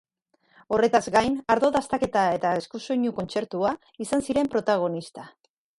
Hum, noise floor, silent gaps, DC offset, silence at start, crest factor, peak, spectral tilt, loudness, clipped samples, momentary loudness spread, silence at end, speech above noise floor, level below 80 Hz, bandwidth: none; -67 dBFS; none; under 0.1%; 0.7 s; 20 dB; -6 dBFS; -5 dB/octave; -25 LUFS; under 0.1%; 8 LU; 0.5 s; 43 dB; -58 dBFS; 11.5 kHz